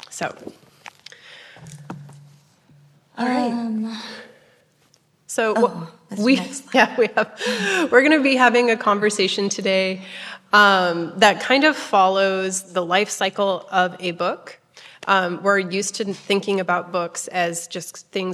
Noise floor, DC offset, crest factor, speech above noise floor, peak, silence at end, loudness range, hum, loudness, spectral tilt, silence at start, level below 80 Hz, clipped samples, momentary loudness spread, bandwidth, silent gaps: -60 dBFS; under 0.1%; 20 dB; 40 dB; -2 dBFS; 0 s; 11 LU; none; -19 LUFS; -3.5 dB/octave; 0.1 s; -72 dBFS; under 0.1%; 17 LU; 14 kHz; none